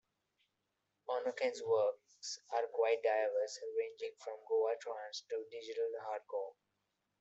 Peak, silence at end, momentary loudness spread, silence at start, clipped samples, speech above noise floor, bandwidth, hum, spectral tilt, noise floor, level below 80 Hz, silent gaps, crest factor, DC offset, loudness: -22 dBFS; 0.7 s; 11 LU; 1.1 s; under 0.1%; 48 dB; 8.2 kHz; none; -2 dB/octave; -86 dBFS; under -90 dBFS; none; 18 dB; under 0.1%; -38 LUFS